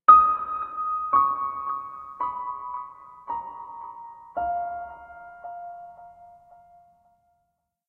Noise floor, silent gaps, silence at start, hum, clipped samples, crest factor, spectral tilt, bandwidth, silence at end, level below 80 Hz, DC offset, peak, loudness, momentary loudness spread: -76 dBFS; none; 0.1 s; none; under 0.1%; 24 dB; -7 dB/octave; 4 kHz; 1.6 s; -60 dBFS; under 0.1%; -2 dBFS; -25 LUFS; 21 LU